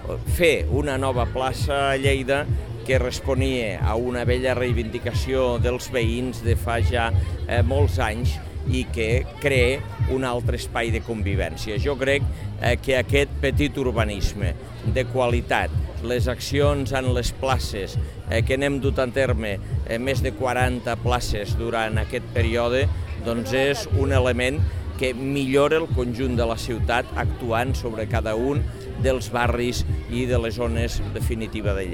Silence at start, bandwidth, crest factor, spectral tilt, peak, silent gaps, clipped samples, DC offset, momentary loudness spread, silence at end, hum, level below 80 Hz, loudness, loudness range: 0 s; 16.5 kHz; 20 dB; -6 dB/octave; -4 dBFS; none; under 0.1%; 0.4%; 6 LU; 0 s; none; -30 dBFS; -23 LUFS; 2 LU